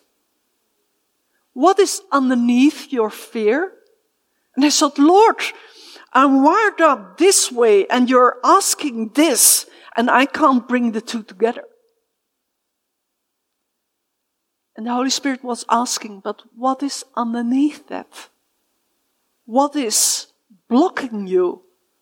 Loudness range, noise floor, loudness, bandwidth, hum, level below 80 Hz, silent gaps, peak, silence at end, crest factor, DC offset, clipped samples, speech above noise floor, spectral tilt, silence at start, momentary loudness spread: 10 LU; -75 dBFS; -16 LUFS; 17 kHz; none; -78 dBFS; none; 0 dBFS; 0.45 s; 18 dB; under 0.1%; under 0.1%; 59 dB; -2 dB/octave; 1.55 s; 13 LU